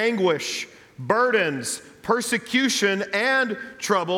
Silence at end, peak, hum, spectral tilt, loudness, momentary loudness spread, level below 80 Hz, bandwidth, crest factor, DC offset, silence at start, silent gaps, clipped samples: 0 s; -6 dBFS; none; -3 dB/octave; -23 LUFS; 10 LU; -66 dBFS; 18 kHz; 16 dB; under 0.1%; 0 s; none; under 0.1%